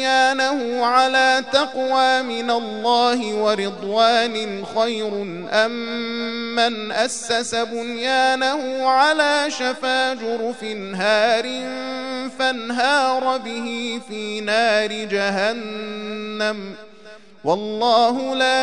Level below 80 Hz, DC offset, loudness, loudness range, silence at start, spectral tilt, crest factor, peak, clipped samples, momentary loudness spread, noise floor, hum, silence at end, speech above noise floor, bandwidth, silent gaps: -68 dBFS; 0.4%; -20 LUFS; 4 LU; 0 s; -2.5 dB/octave; 18 dB; -2 dBFS; under 0.1%; 11 LU; -44 dBFS; none; 0 s; 24 dB; 11 kHz; none